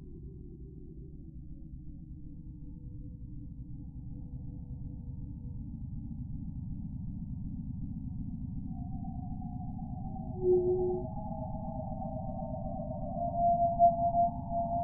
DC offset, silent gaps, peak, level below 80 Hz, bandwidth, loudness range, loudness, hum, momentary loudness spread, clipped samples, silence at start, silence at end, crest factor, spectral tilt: under 0.1%; none; -14 dBFS; -46 dBFS; 1.2 kHz; 15 LU; -35 LUFS; none; 20 LU; under 0.1%; 0 s; 0 s; 20 dB; -2 dB/octave